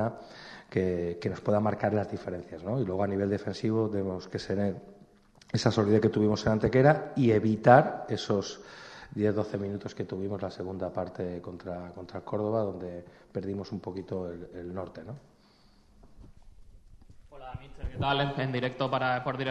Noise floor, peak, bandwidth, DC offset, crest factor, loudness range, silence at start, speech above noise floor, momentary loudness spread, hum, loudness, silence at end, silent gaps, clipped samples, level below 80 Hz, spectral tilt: -60 dBFS; -4 dBFS; 9.4 kHz; under 0.1%; 26 dB; 16 LU; 0 s; 31 dB; 18 LU; none; -29 LUFS; 0 s; none; under 0.1%; -54 dBFS; -7 dB/octave